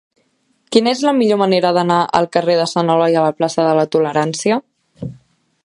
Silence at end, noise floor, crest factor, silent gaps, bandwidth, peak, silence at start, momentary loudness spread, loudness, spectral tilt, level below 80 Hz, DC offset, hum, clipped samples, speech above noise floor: 0.5 s; -62 dBFS; 16 dB; none; 11.5 kHz; 0 dBFS; 0.7 s; 6 LU; -15 LUFS; -5 dB/octave; -58 dBFS; under 0.1%; none; under 0.1%; 47 dB